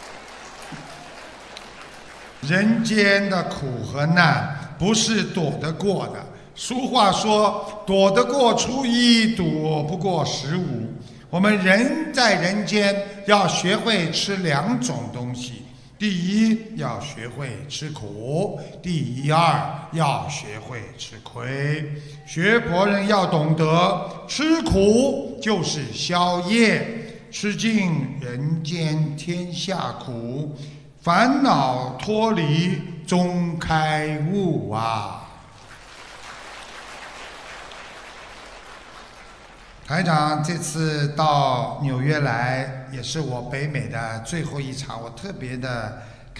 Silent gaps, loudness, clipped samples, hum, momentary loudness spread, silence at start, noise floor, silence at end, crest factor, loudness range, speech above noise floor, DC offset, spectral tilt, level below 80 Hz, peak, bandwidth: none; -21 LUFS; under 0.1%; none; 20 LU; 0 s; -45 dBFS; 0 s; 22 dB; 8 LU; 23 dB; under 0.1%; -5 dB/octave; -48 dBFS; -2 dBFS; 11 kHz